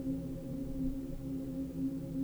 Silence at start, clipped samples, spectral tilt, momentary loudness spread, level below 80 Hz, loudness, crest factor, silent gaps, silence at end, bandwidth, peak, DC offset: 0 s; under 0.1%; -8.5 dB/octave; 3 LU; -46 dBFS; -40 LUFS; 12 dB; none; 0 s; over 20 kHz; -24 dBFS; under 0.1%